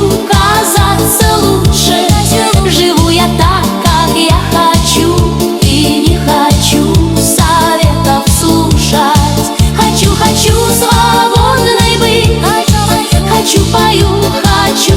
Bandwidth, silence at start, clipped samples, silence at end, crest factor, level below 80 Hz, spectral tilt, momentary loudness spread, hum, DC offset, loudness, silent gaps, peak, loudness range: 19.5 kHz; 0 s; 0.8%; 0 s; 8 dB; -18 dBFS; -4.5 dB/octave; 2 LU; none; under 0.1%; -8 LUFS; none; 0 dBFS; 1 LU